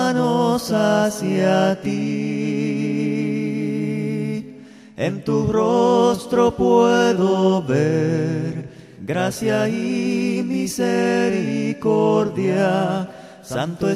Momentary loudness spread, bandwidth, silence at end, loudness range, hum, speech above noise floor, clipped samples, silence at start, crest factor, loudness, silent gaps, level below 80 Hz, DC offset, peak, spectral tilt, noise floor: 10 LU; 15 kHz; 0 s; 5 LU; none; 22 dB; under 0.1%; 0 s; 16 dB; -20 LUFS; none; -52 dBFS; under 0.1%; -2 dBFS; -6 dB/octave; -41 dBFS